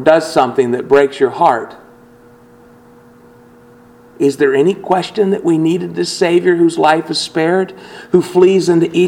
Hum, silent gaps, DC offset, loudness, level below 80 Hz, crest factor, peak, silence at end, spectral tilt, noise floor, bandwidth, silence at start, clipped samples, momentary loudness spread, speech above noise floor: none; none; under 0.1%; -13 LUFS; -56 dBFS; 14 dB; 0 dBFS; 0 s; -5.5 dB/octave; -43 dBFS; 12.5 kHz; 0 s; under 0.1%; 7 LU; 30 dB